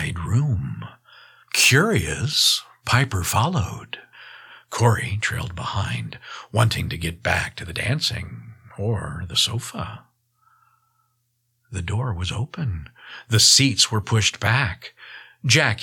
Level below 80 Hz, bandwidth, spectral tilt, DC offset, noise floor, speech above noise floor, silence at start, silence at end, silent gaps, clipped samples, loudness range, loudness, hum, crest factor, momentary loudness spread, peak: -44 dBFS; 18.5 kHz; -3 dB/octave; under 0.1%; -71 dBFS; 49 dB; 0 s; 0 s; none; under 0.1%; 9 LU; -21 LUFS; none; 20 dB; 21 LU; -4 dBFS